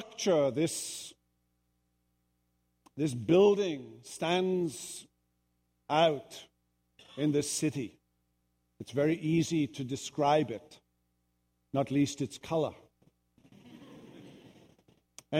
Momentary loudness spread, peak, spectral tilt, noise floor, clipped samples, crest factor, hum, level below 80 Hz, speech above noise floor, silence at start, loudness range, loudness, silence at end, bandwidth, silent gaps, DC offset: 19 LU; -14 dBFS; -5 dB/octave; -77 dBFS; under 0.1%; 20 dB; 60 Hz at -65 dBFS; -70 dBFS; 47 dB; 0 s; 5 LU; -31 LUFS; 0 s; 16 kHz; none; under 0.1%